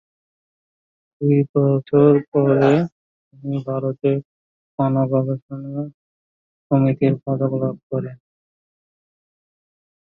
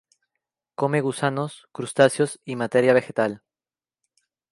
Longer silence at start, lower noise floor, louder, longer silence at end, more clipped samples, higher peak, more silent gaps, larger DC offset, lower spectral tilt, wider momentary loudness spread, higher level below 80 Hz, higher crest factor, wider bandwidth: first, 1.2 s vs 0.8 s; about the same, under -90 dBFS vs under -90 dBFS; first, -20 LUFS vs -23 LUFS; first, 2 s vs 1.15 s; neither; about the same, -2 dBFS vs -4 dBFS; first, 1.49-1.54 s, 2.28-2.32 s, 2.92-3.31 s, 4.25-4.78 s, 5.42-5.49 s, 5.94-6.70 s, 7.83-7.90 s vs none; neither; first, -10.5 dB/octave vs -5.5 dB/octave; about the same, 14 LU vs 14 LU; first, -62 dBFS vs -72 dBFS; about the same, 20 dB vs 22 dB; second, 7.4 kHz vs 11.5 kHz